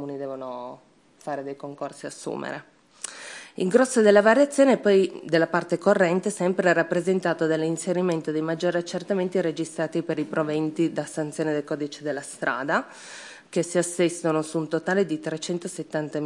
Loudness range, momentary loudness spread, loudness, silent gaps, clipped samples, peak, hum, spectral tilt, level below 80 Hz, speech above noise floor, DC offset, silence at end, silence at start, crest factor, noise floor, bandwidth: 8 LU; 16 LU; -24 LUFS; none; under 0.1%; -4 dBFS; none; -5 dB/octave; -76 dBFS; 30 dB; under 0.1%; 0 s; 0 s; 20 dB; -54 dBFS; 12 kHz